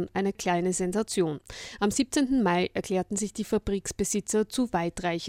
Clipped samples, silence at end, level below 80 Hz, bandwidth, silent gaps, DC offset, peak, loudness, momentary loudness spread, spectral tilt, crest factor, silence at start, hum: under 0.1%; 0 s; -50 dBFS; 16.5 kHz; none; under 0.1%; -12 dBFS; -28 LUFS; 6 LU; -4.5 dB/octave; 16 dB; 0 s; none